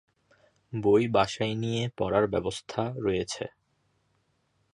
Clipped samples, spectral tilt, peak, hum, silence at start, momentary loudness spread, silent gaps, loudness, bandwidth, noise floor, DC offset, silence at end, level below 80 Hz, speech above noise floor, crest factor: under 0.1%; -5.5 dB/octave; -8 dBFS; none; 0.7 s; 12 LU; none; -28 LUFS; 11 kHz; -72 dBFS; under 0.1%; 1.25 s; -56 dBFS; 45 dB; 22 dB